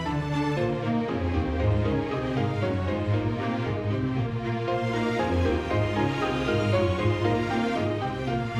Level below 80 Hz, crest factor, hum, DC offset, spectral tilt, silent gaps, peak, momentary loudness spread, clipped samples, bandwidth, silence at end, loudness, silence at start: -40 dBFS; 14 dB; none; under 0.1%; -7.5 dB/octave; none; -12 dBFS; 4 LU; under 0.1%; 10 kHz; 0 s; -27 LUFS; 0 s